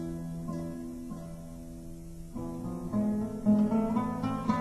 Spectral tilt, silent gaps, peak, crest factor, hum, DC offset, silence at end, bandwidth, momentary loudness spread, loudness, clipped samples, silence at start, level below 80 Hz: -8 dB/octave; none; -14 dBFS; 18 dB; none; under 0.1%; 0 s; 13 kHz; 18 LU; -32 LUFS; under 0.1%; 0 s; -50 dBFS